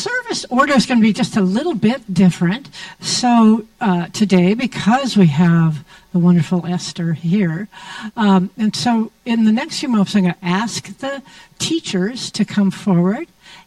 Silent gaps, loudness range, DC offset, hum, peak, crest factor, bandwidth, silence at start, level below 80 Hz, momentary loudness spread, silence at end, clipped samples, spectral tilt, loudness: none; 4 LU; under 0.1%; none; 0 dBFS; 16 dB; 12 kHz; 0 s; -54 dBFS; 12 LU; 0.1 s; under 0.1%; -5.5 dB/octave; -16 LUFS